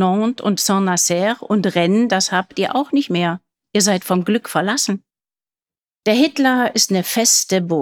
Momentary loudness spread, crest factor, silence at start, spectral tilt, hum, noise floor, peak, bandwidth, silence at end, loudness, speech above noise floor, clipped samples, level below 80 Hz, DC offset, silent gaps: 5 LU; 16 dB; 0 s; -3.5 dB/octave; none; under -90 dBFS; -2 dBFS; 19 kHz; 0 s; -17 LUFS; over 73 dB; under 0.1%; -66 dBFS; under 0.1%; none